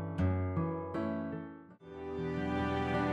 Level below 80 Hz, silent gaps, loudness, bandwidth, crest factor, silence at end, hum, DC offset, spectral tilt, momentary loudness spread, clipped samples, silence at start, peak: -54 dBFS; none; -36 LUFS; 8.4 kHz; 14 dB; 0 s; none; under 0.1%; -8.5 dB/octave; 14 LU; under 0.1%; 0 s; -22 dBFS